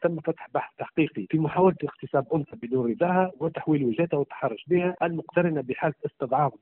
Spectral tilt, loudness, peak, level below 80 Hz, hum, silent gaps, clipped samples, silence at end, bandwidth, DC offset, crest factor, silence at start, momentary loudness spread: -7 dB/octave; -26 LUFS; -8 dBFS; -64 dBFS; none; none; under 0.1%; 0.05 s; 4.1 kHz; under 0.1%; 18 dB; 0 s; 8 LU